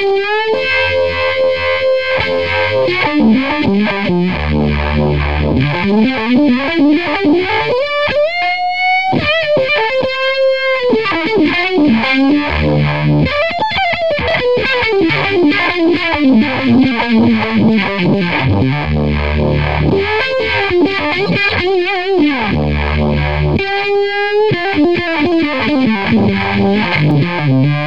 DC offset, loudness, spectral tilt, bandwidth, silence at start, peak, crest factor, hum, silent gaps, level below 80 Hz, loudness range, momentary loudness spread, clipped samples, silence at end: 2%; -13 LUFS; -7.5 dB/octave; 7.8 kHz; 0 s; 0 dBFS; 12 dB; none; none; -28 dBFS; 2 LU; 3 LU; under 0.1%; 0 s